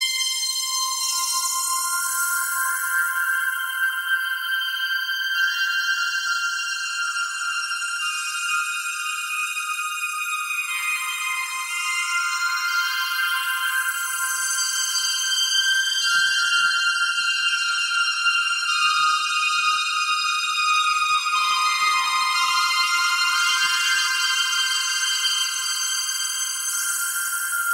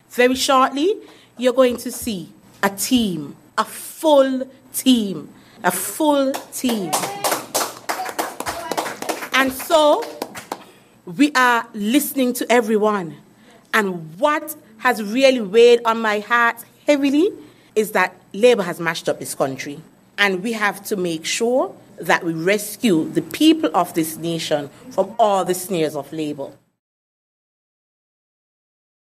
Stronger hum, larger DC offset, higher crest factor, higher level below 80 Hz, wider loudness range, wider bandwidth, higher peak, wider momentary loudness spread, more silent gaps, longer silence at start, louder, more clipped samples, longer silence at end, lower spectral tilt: neither; neither; second, 14 dB vs 20 dB; second, -72 dBFS vs -60 dBFS; about the same, 5 LU vs 5 LU; about the same, 16.5 kHz vs 15.5 kHz; second, -8 dBFS vs 0 dBFS; second, 6 LU vs 12 LU; neither; about the same, 0 s vs 0.1 s; about the same, -21 LUFS vs -19 LUFS; neither; second, 0 s vs 2.65 s; second, 6 dB/octave vs -3.5 dB/octave